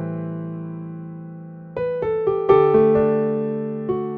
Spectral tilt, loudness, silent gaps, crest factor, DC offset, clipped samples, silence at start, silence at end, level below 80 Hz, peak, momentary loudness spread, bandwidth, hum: -11 dB/octave; -20 LUFS; none; 18 dB; under 0.1%; under 0.1%; 0 s; 0 s; -52 dBFS; -2 dBFS; 19 LU; 4.3 kHz; none